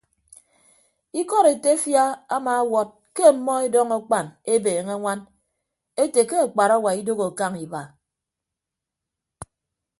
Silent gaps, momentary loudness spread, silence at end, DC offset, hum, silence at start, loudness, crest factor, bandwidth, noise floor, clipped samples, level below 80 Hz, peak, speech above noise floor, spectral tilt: none; 12 LU; 0.55 s; under 0.1%; none; 1.15 s; -21 LUFS; 20 dB; 12 kHz; -86 dBFS; under 0.1%; -68 dBFS; -2 dBFS; 65 dB; -4 dB/octave